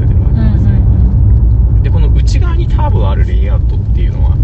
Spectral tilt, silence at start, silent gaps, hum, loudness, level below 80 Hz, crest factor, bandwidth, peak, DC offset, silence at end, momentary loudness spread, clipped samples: -8.5 dB/octave; 0 s; none; none; -11 LUFS; -10 dBFS; 8 dB; 7.2 kHz; 0 dBFS; under 0.1%; 0 s; 3 LU; under 0.1%